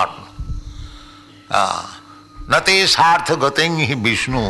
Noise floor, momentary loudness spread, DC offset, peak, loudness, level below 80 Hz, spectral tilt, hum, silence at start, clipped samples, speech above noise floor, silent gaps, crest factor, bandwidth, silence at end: -42 dBFS; 21 LU; under 0.1%; -4 dBFS; -15 LUFS; -36 dBFS; -3.5 dB/octave; none; 0 s; under 0.1%; 26 dB; none; 16 dB; 12.5 kHz; 0 s